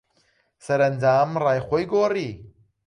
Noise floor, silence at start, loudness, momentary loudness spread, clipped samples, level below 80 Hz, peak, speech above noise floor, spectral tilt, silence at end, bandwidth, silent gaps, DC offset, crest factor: -65 dBFS; 0.65 s; -22 LUFS; 9 LU; under 0.1%; -56 dBFS; -8 dBFS; 44 dB; -7 dB/octave; 0.4 s; 11 kHz; none; under 0.1%; 14 dB